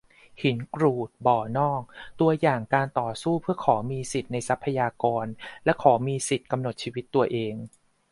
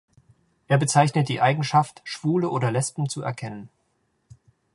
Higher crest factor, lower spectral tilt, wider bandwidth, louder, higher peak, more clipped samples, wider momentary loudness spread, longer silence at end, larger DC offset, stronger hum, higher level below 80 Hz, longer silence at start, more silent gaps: about the same, 22 dB vs 22 dB; about the same, -6 dB/octave vs -5.5 dB/octave; about the same, 11.5 kHz vs 11.5 kHz; second, -26 LUFS vs -23 LUFS; about the same, -4 dBFS vs -2 dBFS; neither; second, 9 LU vs 12 LU; second, 0.45 s vs 1.1 s; neither; neither; first, -60 dBFS vs -66 dBFS; second, 0.4 s vs 0.7 s; neither